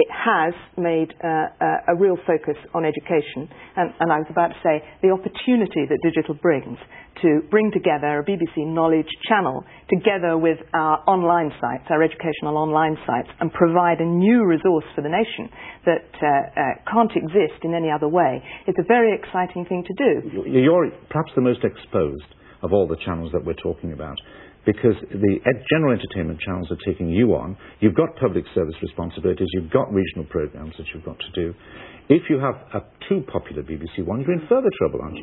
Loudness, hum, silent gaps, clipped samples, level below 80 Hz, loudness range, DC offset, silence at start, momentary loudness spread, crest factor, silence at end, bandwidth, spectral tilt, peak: -21 LUFS; none; none; under 0.1%; -46 dBFS; 4 LU; under 0.1%; 0 s; 11 LU; 20 dB; 0 s; 4.1 kHz; -11.5 dB/octave; 0 dBFS